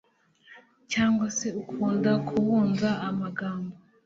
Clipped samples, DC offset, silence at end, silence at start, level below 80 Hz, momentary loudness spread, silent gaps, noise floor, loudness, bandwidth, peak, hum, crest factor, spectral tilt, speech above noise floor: under 0.1%; under 0.1%; 0.3 s; 0.5 s; -62 dBFS; 9 LU; none; -57 dBFS; -27 LUFS; 7.8 kHz; -10 dBFS; none; 16 dB; -5.5 dB/octave; 31 dB